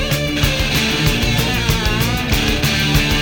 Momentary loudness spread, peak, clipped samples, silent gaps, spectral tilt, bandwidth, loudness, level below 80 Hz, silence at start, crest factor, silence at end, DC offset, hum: 2 LU; -2 dBFS; under 0.1%; none; -4 dB/octave; over 20 kHz; -16 LUFS; -24 dBFS; 0 s; 14 dB; 0 s; under 0.1%; none